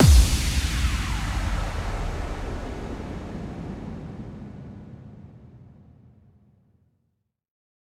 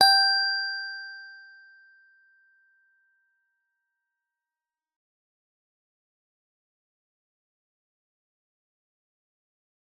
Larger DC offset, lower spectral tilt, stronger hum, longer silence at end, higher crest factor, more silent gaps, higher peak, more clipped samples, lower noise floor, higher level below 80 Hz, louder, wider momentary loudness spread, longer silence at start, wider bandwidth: neither; first, -5 dB/octave vs 3 dB/octave; neither; second, 2.35 s vs 8.6 s; second, 20 dB vs 26 dB; neither; about the same, -6 dBFS vs -6 dBFS; neither; second, -75 dBFS vs under -90 dBFS; first, -28 dBFS vs under -90 dBFS; second, -27 LUFS vs -22 LUFS; second, 20 LU vs 25 LU; about the same, 0 s vs 0 s; first, 15.5 kHz vs 10 kHz